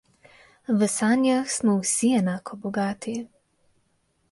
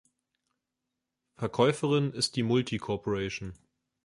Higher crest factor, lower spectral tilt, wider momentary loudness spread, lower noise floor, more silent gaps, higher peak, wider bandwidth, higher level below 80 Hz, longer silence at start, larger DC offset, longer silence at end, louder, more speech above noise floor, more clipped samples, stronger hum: second, 16 dB vs 22 dB; about the same, -4.5 dB/octave vs -5.5 dB/octave; about the same, 12 LU vs 11 LU; second, -69 dBFS vs -86 dBFS; neither; about the same, -10 dBFS vs -10 dBFS; about the same, 11.5 kHz vs 11.5 kHz; second, -66 dBFS vs -60 dBFS; second, 0.7 s vs 1.4 s; neither; first, 1.05 s vs 0.5 s; first, -24 LUFS vs -29 LUFS; second, 46 dB vs 57 dB; neither; neither